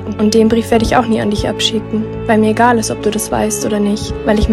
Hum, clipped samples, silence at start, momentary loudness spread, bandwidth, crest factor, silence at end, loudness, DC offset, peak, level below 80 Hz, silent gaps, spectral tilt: none; under 0.1%; 0 s; 6 LU; 14.5 kHz; 14 dB; 0 s; -14 LUFS; under 0.1%; 0 dBFS; -28 dBFS; none; -4.5 dB/octave